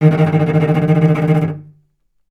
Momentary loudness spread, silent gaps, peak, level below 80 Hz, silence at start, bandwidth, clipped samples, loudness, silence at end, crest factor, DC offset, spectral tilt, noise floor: 7 LU; none; 0 dBFS; -52 dBFS; 0 s; 4.2 kHz; under 0.1%; -14 LUFS; 0.7 s; 14 dB; under 0.1%; -9.5 dB/octave; -61 dBFS